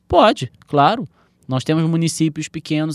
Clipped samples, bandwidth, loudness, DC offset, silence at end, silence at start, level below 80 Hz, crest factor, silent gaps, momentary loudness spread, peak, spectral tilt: under 0.1%; 12.5 kHz; -18 LUFS; under 0.1%; 0 s; 0.1 s; -46 dBFS; 18 dB; none; 12 LU; 0 dBFS; -5.5 dB/octave